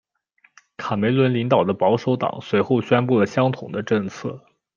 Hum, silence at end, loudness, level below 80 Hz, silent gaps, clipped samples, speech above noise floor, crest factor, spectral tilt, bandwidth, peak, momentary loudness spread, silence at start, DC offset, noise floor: none; 0.4 s; -20 LUFS; -64 dBFS; none; under 0.1%; 41 dB; 18 dB; -7.5 dB/octave; 7.2 kHz; -4 dBFS; 11 LU; 0.8 s; under 0.1%; -61 dBFS